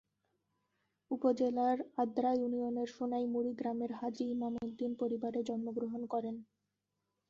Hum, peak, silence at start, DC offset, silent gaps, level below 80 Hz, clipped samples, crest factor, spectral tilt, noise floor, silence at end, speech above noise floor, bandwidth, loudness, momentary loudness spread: none; -20 dBFS; 1.1 s; under 0.1%; none; -78 dBFS; under 0.1%; 18 dB; -6 dB/octave; -86 dBFS; 0.85 s; 51 dB; 7.6 kHz; -37 LUFS; 7 LU